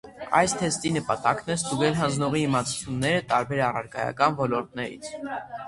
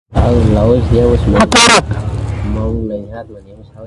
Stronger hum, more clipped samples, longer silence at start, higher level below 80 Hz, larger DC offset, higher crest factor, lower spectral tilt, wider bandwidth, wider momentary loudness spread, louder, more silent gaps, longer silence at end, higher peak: neither; neither; about the same, 0.05 s vs 0.1 s; second, -56 dBFS vs -20 dBFS; neither; first, 20 dB vs 12 dB; about the same, -4.5 dB/octave vs -4.5 dB/octave; about the same, 11.5 kHz vs 11.5 kHz; second, 11 LU vs 15 LU; second, -25 LUFS vs -11 LUFS; neither; about the same, 0 s vs 0 s; second, -6 dBFS vs 0 dBFS